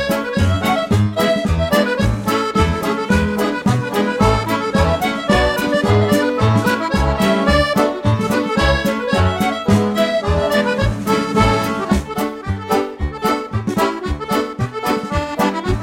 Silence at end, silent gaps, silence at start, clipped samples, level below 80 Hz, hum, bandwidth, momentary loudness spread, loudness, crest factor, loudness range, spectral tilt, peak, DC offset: 0 s; none; 0 s; under 0.1%; -28 dBFS; none; 17 kHz; 5 LU; -17 LUFS; 16 dB; 4 LU; -6 dB/octave; 0 dBFS; under 0.1%